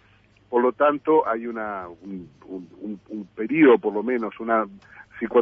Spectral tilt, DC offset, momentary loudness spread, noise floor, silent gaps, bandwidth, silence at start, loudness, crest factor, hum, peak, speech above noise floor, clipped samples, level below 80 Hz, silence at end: -8.5 dB/octave; under 0.1%; 21 LU; -57 dBFS; none; 3.7 kHz; 0.5 s; -22 LUFS; 18 dB; none; -4 dBFS; 34 dB; under 0.1%; -64 dBFS; 0 s